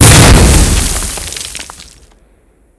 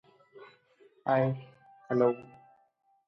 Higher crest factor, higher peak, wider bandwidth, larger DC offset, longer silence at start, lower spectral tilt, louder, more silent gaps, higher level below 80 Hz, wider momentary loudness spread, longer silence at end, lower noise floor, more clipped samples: second, 8 dB vs 20 dB; first, 0 dBFS vs -12 dBFS; first, 11 kHz vs 6 kHz; neither; second, 0 s vs 0.35 s; second, -3.5 dB/octave vs -10 dB/octave; first, -8 LUFS vs -30 LUFS; neither; first, -14 dBFS vs -78 dBFS; first, 20 LU vs 13 LU; about the same, 0.95 s vs 0.85 s; second, -48 dBFS vs -70 dBFS; first, 5% vs under 0.1%